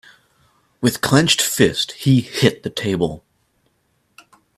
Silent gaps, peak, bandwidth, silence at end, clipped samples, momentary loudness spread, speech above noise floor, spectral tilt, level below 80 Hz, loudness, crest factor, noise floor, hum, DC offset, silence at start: none; 0 dBFS; 15.5 kHz; 1.4 s; under 0.1%; 9 LU; 48 dB; -4.5 dB/octave; -50 dBFS; -17 LUFS; 20 dB; -65 dBFS; none; under 0.1%; 0.8 s